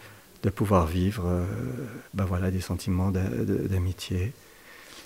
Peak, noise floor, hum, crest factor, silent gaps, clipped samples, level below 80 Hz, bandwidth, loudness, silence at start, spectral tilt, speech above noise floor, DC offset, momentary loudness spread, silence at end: -8 dBFS; -49 dBFS; none; 20 dB; none; under 0.1%; -44 dBFS; 16 kHz; -28 LUFS; 0 s; -7 dB/octave; 22 dB; under 0.1%; 13 LU; 0 s